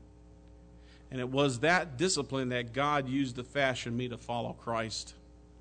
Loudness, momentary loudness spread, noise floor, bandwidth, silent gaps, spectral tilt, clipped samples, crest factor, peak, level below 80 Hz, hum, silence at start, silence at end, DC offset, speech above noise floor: -32 LUFS; 9 LU; -55 dBFS; 9.4 kHz; none; -4.5 dB/octave; under 0.1%; 20 dB; -14 dBFS; -56 dBFS; none; 0 s; 0 s; under 0.1%; 23 dB